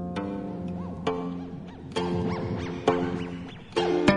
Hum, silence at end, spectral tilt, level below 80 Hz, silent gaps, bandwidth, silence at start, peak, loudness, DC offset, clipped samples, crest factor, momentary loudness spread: none; 0 s; -6.5 dB/octave; -54 dBFS; none; 11 kHz; 0 s; -6 dBFS; -30 LUFS; under 0.1%; under 0.1%; 24 dB; 10 LU